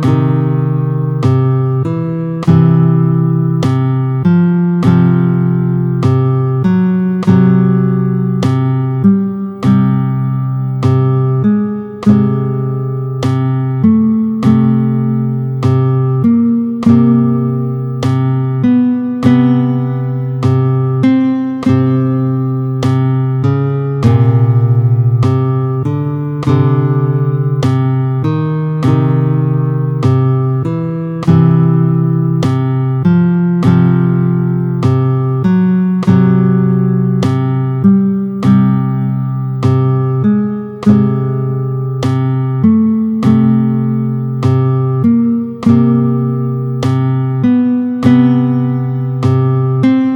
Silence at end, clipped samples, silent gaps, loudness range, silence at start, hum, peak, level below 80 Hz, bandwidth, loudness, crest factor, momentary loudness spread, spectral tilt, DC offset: 0 s; under 0.1%; none; 2 LU; 0 s; none; 0 dBFS; -48 dBFS; 6.4 kHz; -12 LUFS; 10 dB; 6 LU; -9.5 dB/octave; under 0.1%